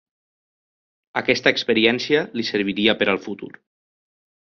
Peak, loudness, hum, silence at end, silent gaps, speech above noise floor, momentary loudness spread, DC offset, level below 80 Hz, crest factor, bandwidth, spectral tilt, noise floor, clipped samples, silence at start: -2 dBFS; -20 LUFS; none; 1.05 s; none; over 69 dB; 13 LU; under 0.1%; -60 dBFS; 22 dB; 7 kHz; -2 dB/octave; under -90 dBFS; under 0.1%; 1.15 s